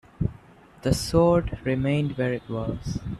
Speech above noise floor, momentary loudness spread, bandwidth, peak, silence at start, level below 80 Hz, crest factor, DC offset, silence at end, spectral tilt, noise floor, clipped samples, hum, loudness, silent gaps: 26 dB; 11 LU; 14 kHz; -6 dBFS; 0.2 s; -40 dBFS; 20 dB; under 0.1%; 0 s; -6.5 dB/octave; -50 dBFS; under 0.1%; none; -25 LUFS; none